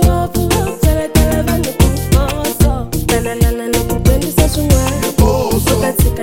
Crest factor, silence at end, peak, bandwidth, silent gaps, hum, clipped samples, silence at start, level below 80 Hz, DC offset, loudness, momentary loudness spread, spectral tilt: 12 dB; 0 s; 0 dBFS; 17 kHz; none; none; under 0.1%; 0 s; -18 dBFS; under 0.1%; -14 LUFS; 3 LU; -5.5 dB/octave